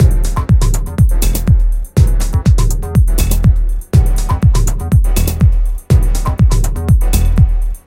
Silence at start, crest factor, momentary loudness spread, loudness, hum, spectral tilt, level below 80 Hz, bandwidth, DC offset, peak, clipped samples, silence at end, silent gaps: 0 s; 10 dB; 3 LU; -14 LUFS; none; -6.5 dB/octave; -12 dBFS; 17 kHz; under 0.1%; 0 dBFS; under 0.1%; 0.1 s; none